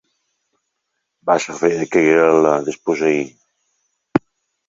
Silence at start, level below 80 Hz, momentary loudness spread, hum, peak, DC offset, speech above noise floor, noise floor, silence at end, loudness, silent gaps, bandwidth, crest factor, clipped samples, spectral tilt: 1.25 s; -60 dBFS; 10 LU; none; 0 dBFS; under 0.1%; 59 dB; -75 dBFS; 0.5 s; -17 LUFS; none; 7.8 kHz; 18 dB; under 0.1%; -5.5 dB/octave